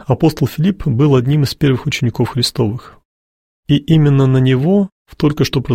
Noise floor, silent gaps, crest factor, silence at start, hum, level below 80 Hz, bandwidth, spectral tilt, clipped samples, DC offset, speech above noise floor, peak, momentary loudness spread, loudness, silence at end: under -90 dBFS; 3.05-3.63 s, 4.92-5.05 s; 14 dB; 0.1 s; none; -40 dBFS; 16 kHz; -7 dB/octave; under 0.1%; under 0.1%; over 77 dB; 0 dBFS; 6 LU; -14 LUFS; 0 s